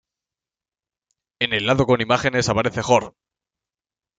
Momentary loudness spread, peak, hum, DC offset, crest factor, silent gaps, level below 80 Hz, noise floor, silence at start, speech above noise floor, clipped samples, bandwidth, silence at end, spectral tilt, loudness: 4 LU; -2 dBFS; none; under 0.1%; 20 dB; none; -50 dBFS; under -90 dBFS; 1.4 s; over 71 dB; under 0.1%; 9.4 kHz; 1.1 s; -4.5 dB/octave; -19 LUFS